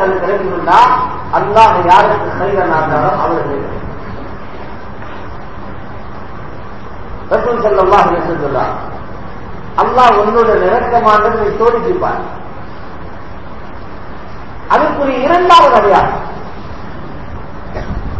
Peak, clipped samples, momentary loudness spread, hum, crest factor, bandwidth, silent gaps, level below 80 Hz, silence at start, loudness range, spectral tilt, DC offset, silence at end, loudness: 0 dBFS; 1%; 22 LU; none; 14 dB; 8 kHz; none; -32 dBFS; 0 s; 11 LU; -6 dB/octave; 6%; 0 s; -11 LUFS